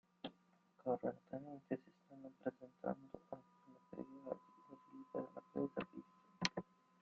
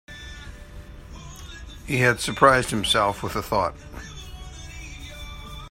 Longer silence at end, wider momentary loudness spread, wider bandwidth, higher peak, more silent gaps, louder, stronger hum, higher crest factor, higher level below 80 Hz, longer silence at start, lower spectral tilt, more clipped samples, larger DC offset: first, 0.4 s vs 0 s; second, 19 LU vs 24 LU; second, 7.4 kHz vs 16 kHz; second, -18 dBFS vs 0 dBFS; neither; second, -48 LUFS vs -21 LUFS; neither; first, 32 dB vs 26 dB; second, -82 dBFS vs -42 dBFS; first, 0.25 s vs 0.1 s; about the same, -4 dB/octave vs -4 dB/octave; neither; neither